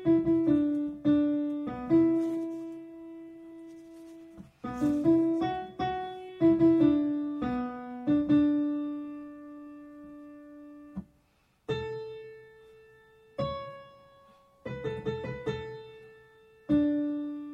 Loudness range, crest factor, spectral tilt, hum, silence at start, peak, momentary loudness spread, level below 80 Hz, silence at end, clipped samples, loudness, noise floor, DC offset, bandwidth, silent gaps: 15 LU; 16 dB; -8.5 dB/octave; none; 0 s; -14 dBFS; 23 LU; -58 dBFS; 0 s; under 0.1%; -29 LUFS; -68 dBFS; under 0.1%; 6.6 kHz; none